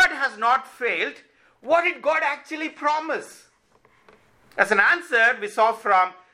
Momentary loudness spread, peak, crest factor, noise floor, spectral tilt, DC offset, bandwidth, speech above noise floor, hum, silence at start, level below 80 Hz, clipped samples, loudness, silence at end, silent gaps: 11 LU; -2 dBFS; 22 dB; -60 dBFS; -2.5 dB/octave; under 0.1%; 15 kHz; 38 dB; none; 0 s; -66 dBFS; under 0.1%; -21 LUFS; 0.2 s; none